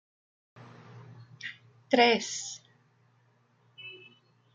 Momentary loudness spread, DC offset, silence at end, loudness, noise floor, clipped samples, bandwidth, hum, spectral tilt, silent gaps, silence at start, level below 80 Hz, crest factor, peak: 28 LU; under 0.1%; 0.6 s; -27 LUFS; -67 dBFS; under 0.1%; 9.6 kHz; none; -2.5 dB/octave; none; 0.6 s; -82 dBFS; 26 dB; -8 dBFS